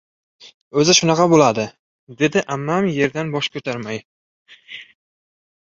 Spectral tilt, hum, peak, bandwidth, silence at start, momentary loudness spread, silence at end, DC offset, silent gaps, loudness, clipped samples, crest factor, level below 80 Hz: -4 dB/octave; none; 0 dBFS; 7.8 kHz; 0.45 s; 19 LU; 0.85 s; under 0.1%; 0.54-0.71 s, 1.79-2.07 s, 4.05-4.45 s; -18 LUFS; under 0.1%; 20 dB; -58 dBFS